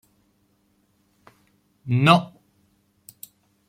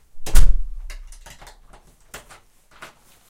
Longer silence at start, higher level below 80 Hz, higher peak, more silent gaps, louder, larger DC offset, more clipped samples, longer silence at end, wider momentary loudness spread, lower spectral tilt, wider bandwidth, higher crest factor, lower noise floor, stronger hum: first, 1.85 s vs 0.15 s; second, -64 dBFS vs -22 dBFS; about the same, 0 dBFS vs 0 dBFS; neither; first, -19 LUFS vs -25 LUFS; neither; neither; second, 1.4 s vs 2.4 s; first, 28 LU vs 24 LU; first, -6.5 dB/octave vs -3.5 dB/octave; first, 16 kHz vs 14 kHz; first, 26 dB vs 18 dB; first, -66 dBFS vs -50 dBFS; neither